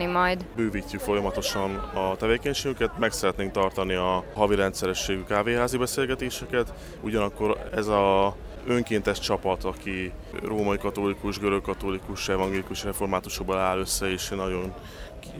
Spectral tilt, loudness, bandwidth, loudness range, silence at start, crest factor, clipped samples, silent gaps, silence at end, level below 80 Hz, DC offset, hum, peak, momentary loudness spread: -4.5 dB/octave; -27 LUFS; over 20 kHz; 3 LU; 0 s; 20 dB; under 0.1%; none; 0 s; -42 dBFS; under 0.1%; none; -6 dBFS; 7 LU